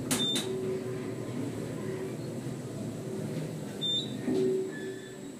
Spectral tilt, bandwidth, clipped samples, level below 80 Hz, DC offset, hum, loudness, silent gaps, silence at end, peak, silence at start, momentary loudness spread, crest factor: -4.5 dB/octave; 15.5 kHz; under 0.1%; -66 dBFS; under 0.1%; none; -34 LUFS; none; 0 s; -16 dBFS; 0 s; 9 LU; 18 dB